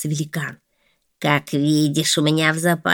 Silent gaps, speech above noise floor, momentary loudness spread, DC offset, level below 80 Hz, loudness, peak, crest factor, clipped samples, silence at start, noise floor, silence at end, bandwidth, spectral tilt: none; 47 dB; 9 LU; under 0.1%; -64 dBFS; -19 LUFS; -2 dBFS; 20 dB; under 0.1%; 0 s; -66 dBFS; 0 s; 20 kHz; -4.5 dB/octave